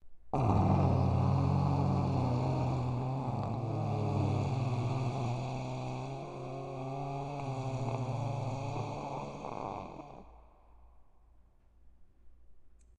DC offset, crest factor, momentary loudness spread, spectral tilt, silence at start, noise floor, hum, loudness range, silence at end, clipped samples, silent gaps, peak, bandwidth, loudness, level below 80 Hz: under 0.1%; 20 dB; 12 LU; -8.5 dB/octave; 0.05 s; -61 dBFS; none; 14 LU; 0.3 s; under 0.1%; none; -14 dBFS; 9 kHz; -34 LUFS; -52 dBFS